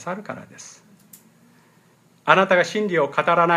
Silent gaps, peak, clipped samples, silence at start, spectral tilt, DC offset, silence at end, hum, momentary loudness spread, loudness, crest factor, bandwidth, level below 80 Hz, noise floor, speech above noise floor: none; 0 dBFS; under 0.1%; 0 s; -5 dB/octave; under 0.1%; 0 s; none; 25 LU; -19 LUFS; 22 dB; 15 kHz; -74 dBFS; -57 dBFS; 37 dB